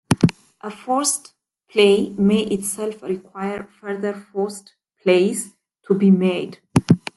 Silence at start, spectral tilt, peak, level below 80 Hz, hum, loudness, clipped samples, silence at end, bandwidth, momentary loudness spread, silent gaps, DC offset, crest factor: 0.1 s; -5.5 dB/octave; 0 dBFS; -54 dBFS; none; -20 LUFS; under 0.1%; 0.2 s; 12.5 kHz; 14 LU; none; under 0.1%; 20 dB